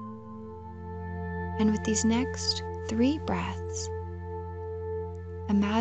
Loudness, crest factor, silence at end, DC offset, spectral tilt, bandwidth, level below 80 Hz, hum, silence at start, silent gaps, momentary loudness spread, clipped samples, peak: -30 LUFS; 16 dB; 0 s; under 0.1%; -5 dB/octave; 8.8 kHz; -48 dBFS; none; 0 s; none; 15 LU; under 0.1%; -14 dBFS